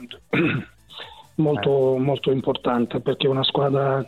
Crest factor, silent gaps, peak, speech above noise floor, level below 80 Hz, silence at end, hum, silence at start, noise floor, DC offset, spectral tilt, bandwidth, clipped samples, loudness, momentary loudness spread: 16 dB; none; -6 dBFS; 21 dB; -56 dBFS; 0 s; none; 0 s; -41 dBFS; 0.1%; -8 dB/octave; 9.2 kHz; under 0.1%; -22 LUFS; 15 LU